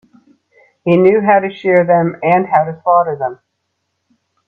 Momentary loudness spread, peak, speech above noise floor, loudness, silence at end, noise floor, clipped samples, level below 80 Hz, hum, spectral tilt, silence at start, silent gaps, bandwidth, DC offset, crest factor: 10 LU; 0 dBFS; 58 dB; -13 LUFS; 1.15 s; -70 dBFS; under 0.1%; -60 dBFS; none; -9.5 dB/octave; 0.85 s; none; 4.6 kHz; under 0.1%; 14 dB